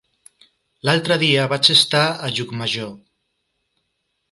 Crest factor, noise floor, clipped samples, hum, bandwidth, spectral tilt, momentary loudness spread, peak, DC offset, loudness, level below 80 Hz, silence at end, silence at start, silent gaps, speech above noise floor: 22 dB; -73 dBFS; under 0.1%; none; 11.5 kHz; -3.5 dB/octave; 12 LU; 0 dBFS; under 0.1%; -17 LUFS; -62 dBFS; 1.35 s; 0.85 s; none; 54 dB